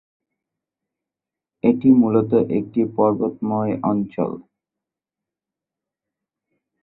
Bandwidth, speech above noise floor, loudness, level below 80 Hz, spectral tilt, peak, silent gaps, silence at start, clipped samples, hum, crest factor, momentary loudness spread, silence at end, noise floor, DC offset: 4 kHz; 69 dB; -19 LUFS; -62 dBFS; -13.5 dB/octave; -4 dBFS; none; 1.65 s; under 0.1%; none; 18 dB; 10 LU; 2.4 s; -87 dBFS; under 0.1%